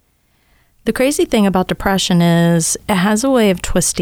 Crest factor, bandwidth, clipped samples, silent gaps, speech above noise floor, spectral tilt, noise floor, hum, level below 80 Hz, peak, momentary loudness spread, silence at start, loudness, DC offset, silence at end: 12 dB; 17.5 kHz; under 0.1%; none; 45 dB; -4.5 dB/octave; -58 dBFS; none; -34 dBFS; -2 dBFS; 4 LU; 0.85 s; -14 LUFS; under 0.1%; 0 s